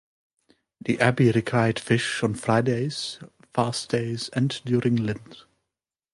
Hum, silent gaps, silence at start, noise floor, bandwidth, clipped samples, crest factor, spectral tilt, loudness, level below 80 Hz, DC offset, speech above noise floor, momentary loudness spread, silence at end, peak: none; none; 0.85 s; -87 dBFS; 11.5 kHz; under 0.1%; 20 dB; -6 dB/octave; -24 LUFS; -60 dBFS; under 0.1%; 63 dB; 10 LU; 0.75 s; -4 dBFS